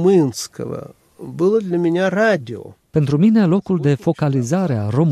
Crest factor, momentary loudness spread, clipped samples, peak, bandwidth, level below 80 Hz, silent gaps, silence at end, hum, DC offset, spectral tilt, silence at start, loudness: 12 dB; 16 LU; under 0.1%; -4 dBFS; 13.5 kHz; -54 dBFS; none; 0 s; none; under 0.1%; -7 dB/octave; 0 s; -17 LUFS